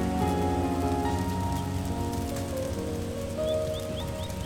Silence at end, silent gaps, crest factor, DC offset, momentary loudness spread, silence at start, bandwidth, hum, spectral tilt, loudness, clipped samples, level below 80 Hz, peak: 0 s; none; 14 dB; under 0.1%; 6 LU; 0 s; 18 kHz; none; -6 dB/octave; -30 LUFS; under 0.1%; -40 dBFS; -14 dBFS